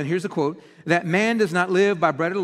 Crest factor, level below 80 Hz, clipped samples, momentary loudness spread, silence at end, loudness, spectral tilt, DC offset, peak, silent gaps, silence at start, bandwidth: 18 dB; -68 dBFS; under 0.1%; 7 LU; 0 s; -21 LUFS; -6 dB/octave; under 0.1%; -4 dBFS; none; 0 s; 13 kHz